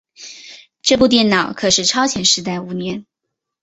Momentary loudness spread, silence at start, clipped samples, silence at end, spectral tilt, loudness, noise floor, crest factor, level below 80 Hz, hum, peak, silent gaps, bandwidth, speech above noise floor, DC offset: 21 LU; 0.2 s; under 0.1%; 0.6 s; -2.5 dB/octave; -15 LUFS; -79 dBFS; 18 dB; -50 dBFS; none; 0 dBFS; none; 8.4 kHz; 63 dB; under 0.1%